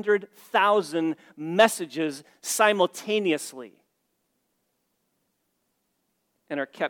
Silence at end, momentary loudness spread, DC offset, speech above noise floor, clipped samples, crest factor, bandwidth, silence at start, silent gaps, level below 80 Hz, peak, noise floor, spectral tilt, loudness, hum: 0 s; 14 LU; under 0.1%; 50 dB; under 0.1%; 24 dB; 19 kHz; 0 s; none; -80 dBFS; -4 dBFS; -75 dBFS; -3 dB/octave; -25 LUFS; none